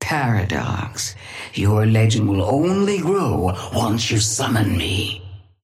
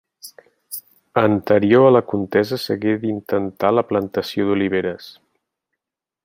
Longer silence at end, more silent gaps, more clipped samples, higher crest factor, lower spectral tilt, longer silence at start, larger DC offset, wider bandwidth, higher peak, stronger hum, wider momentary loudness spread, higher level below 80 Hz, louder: second, 0.2 s vs 1.15 s; neither; neither; second, 12 dB vs 18 dB; second, -5 dB/octave vs -6.5 dB/octave; second, 0 s vs 0.25 s; neither; about the same, 15 kHz vs 16.5 kHz; second, -6 dBFS vs -2 dBFS; neither; second, 10 LU vs 17 LU; first, -44 dBFS vs -64 dBFS; about the same, -19 LUFS vs -18 LUFS